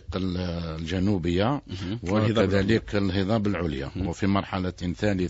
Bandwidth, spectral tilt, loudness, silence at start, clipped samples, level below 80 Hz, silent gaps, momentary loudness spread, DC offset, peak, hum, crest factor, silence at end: 8 kHz; -7 dB/octave; -26 LUFS; 0.1 s; under 0.1%; -44 dBFS; none; 9 LU; under 0.1%; -8 dBFS; none; 18 dB; 0 s